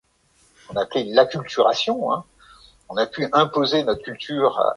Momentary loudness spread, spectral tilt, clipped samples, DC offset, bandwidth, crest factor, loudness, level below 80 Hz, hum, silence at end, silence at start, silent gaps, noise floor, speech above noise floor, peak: 9 LU; -5 dB/octave; under 0.1%; under 0.1%; 11 kHz; 18 dB; -21 LUFS; -58 dBFS; none; 0 s; 0.7 s; none; -60 dBFS; 40 dB; -2 dBFS